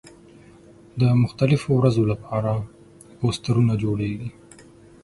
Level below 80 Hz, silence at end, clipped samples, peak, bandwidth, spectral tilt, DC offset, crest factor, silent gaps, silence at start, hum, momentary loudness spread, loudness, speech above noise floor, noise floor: -50 dBFS; 0.75 s; under 0.1%; -4 dBFS; 11.5 kHz; -8 dB/octave; under 0.1%; 18 dB; none; 0.95 s; none; 13 LU; -22 LUFS; 28 dB; -48 dBFS